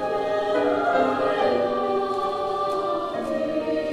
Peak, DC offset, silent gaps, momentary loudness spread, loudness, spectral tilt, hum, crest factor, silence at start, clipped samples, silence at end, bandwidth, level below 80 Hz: -8 dBFS; under 0.1%; none; 5 LU; -24 LUFS; -5.5 dB/octave; none; 16 dB; 0 s; under 0.1%; 0 s; 12.5 kHz; -58 dBFS